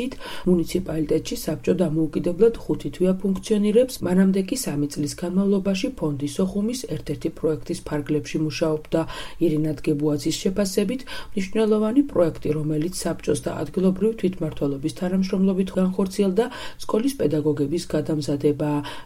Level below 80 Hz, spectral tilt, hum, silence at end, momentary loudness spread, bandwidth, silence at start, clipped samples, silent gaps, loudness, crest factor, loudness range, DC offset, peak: -44 dBFS; -6.5 dB/octave; none; 0 s; 7 LU; 16 kHz; 0 s; under 0.1%; none; -23 LUFS; 18 dB; 3 LU; under 0.1%; -6 dBFS